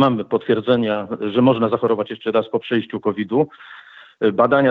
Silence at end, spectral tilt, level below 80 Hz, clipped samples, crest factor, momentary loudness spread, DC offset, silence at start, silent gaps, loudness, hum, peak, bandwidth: 0 s; -9 dB/octave; -66 dBFS; under 0.1%; 18 dB; 8 LU; under 0.1%; 0 s; none; -19 LUFS; none; -2 dBFS; 5 kHz